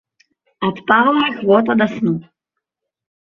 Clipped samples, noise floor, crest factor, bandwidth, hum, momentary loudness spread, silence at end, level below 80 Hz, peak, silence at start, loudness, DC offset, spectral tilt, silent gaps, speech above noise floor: under 0.1%; -80 dBFS; 16 dB; 6.6 kHz; none; 10 LU; 1 s; -60 dBFS; -2 dBFS; 0.6 s; -16 LUFS; under 0.1%; -7.5 dB/octave; none; 65 dB